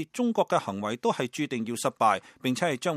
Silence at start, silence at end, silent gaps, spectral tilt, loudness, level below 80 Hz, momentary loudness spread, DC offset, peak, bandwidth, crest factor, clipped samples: 0 s; 0 s; none; -4.5 dB/octave; -28 LUFS; -74 dBFS; 6 LU; under 0.1%; -10 dBFS; 15 kHz; 18 dB; under 0.1%